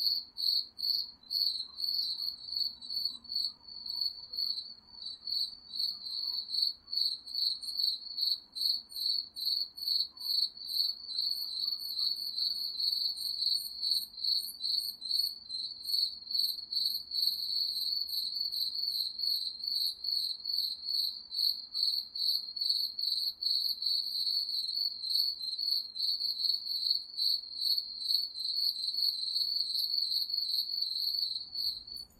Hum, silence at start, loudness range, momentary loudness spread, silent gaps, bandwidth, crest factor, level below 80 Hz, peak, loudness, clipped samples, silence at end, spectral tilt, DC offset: none; 0 s; 3 LU; 4 LU; none; 15 kHz; 18 dB; -76 dBFS; -16 dBFS; -31 LUFS; under 0.1%; 0.15 s; 1.5 dB/octave; under 0.1%